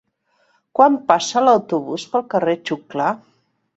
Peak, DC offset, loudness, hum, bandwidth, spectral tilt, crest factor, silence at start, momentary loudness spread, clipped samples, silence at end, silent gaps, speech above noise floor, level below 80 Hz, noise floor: 0 dBFS; under 0.1%; -18 LUFS; none; 8.2 kHz; -4.5 dB/octave; 20 dB; 0.75 s; 10 LU; under 0.1%; 0.6 s; none; 46 dB; -66 dBFS; -64 dBFS